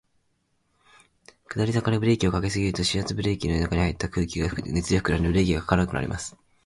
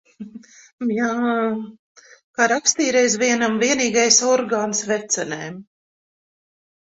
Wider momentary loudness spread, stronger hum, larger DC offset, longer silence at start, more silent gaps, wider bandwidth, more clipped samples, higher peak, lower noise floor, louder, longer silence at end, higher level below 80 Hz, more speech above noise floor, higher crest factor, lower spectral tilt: second, 6 LU vs 20 LU; neither; neither; first, 1.5 s vs 0.2 s; second, none vs 0.73-0.78 s, 1.79-1.95 s, 2.24-2.34 s; first, 11.5 kHz vs 8.2 kHz; neither; second, -6 dBFS vs 0 dBFS; first, -71 dBFS vs -41 dBFS; second, -25 LUFS vs -19 LUFS; second, 0.35 s vs 1.25 s; first, -38 dBFS vs -66 dBFS; first, 47 dB vs 22 dB; about the same, 20 dB vs 22 dB; first, -5.5 dB/octave vs -2 dB/octave